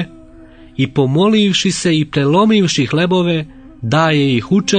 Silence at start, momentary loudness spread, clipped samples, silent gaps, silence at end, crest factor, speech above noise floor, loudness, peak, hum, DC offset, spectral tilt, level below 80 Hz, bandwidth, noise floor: 0 s; 9 LU; under 0.1%; none; 0 s; 12 dB; 26 dB; -14 LUFS; -2 dBFS; none; under 0.1%; -5.5 dB/octave; -46 dBFS; 9.6 kHz; -39 dBFS